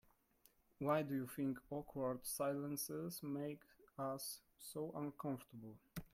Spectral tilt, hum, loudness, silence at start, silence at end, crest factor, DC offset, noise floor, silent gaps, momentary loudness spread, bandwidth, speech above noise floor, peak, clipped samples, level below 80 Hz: -5 dB/octave; none; -45 LUFS; 0.8 s; 0.05 s; 20 dB; under 0.1%; -75 dBFS; none; 13 LU; 16.5 kHz; 31 dB; -26 dBFS; under 0.1%; -74 dBFS